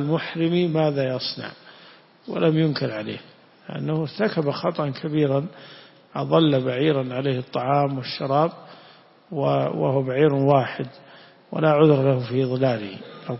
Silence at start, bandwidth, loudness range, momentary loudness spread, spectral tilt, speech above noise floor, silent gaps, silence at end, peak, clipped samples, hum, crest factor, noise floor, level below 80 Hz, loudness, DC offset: 0 s; 5.8 kHz; 5 LU; 15 LU; -11 dB/octave; 29 dB; none; 0 s; -4 dBFS; under 0.1%; none; 20 dB; -51 dBFS; -64 dBFS; -22 LUFS; under 0.1%